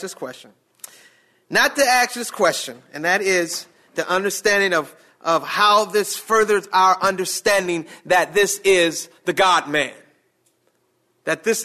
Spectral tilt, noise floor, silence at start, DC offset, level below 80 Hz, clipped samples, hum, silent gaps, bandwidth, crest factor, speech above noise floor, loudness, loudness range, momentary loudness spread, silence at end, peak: -2 dB/octave; -66 dBFS; 0 s; under 0.1%; -62 dBFS; under 0.1%; none; none; 14 kHz; 16 dB; 47 dB; -19 LUFS; 3 LU; 12 LU; 0 s; -6 dBFS